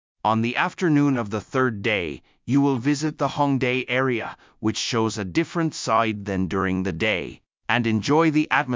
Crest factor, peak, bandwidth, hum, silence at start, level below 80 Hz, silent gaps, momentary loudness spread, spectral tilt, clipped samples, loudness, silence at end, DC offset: 20 dB; -4 dBFS; 7.6 kHz; none; 0.25 s; -50 dBFS; none; 7 LU; -5.5 dB/octave; under 0.1%; -23 LUFS; 0 s; under 0.1%